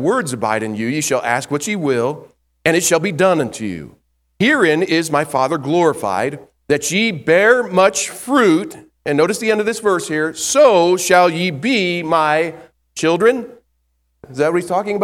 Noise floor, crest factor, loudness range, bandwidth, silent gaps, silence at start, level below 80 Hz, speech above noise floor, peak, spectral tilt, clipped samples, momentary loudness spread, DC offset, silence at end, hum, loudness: -65 dBFS; 16 dB; 3 LU; 16.5 kHz; none; 0 s; -58 dBFS; 50 dB; 0 dBFS; -4 dB/octave; under 0.1%; 10 LU; under 0.1%; 0 s; none; -16 LUFS